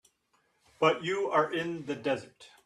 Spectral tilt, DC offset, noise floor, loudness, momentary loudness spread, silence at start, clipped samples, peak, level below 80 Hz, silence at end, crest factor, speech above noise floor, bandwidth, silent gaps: -5 dB/octave; under 0.1%; -73 dBFS; -30 LUFS; 8 LU; 0.8 s; under 0.1%; -10 dBFS; -76 dBFS; 0.2 s; 20 dB; 42 dB; 12.5 kHz; none